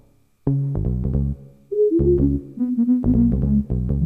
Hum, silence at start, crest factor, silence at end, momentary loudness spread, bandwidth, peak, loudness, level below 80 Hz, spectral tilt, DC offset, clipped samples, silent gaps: none; 0.45 s; 12 dB; 0 s; 9 LU; 1.9 kHz; -6 dBFS; -20 LUFS; -28 dBFS; -13.5 dB/octave; under 0.1%; under 0.1%; none